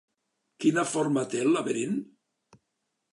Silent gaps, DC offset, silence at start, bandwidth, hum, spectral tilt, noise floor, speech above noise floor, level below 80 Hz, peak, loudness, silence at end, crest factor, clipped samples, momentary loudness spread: none; under 0.1%; 0.6 s; 11.5 kHz; none; -5 dB/octave; -81 dBFS; 54 dB; -82 dBFS; -12 dBFS; -27 LUFS; 1.1 s; 18 dB; under 0.1%; 5 LU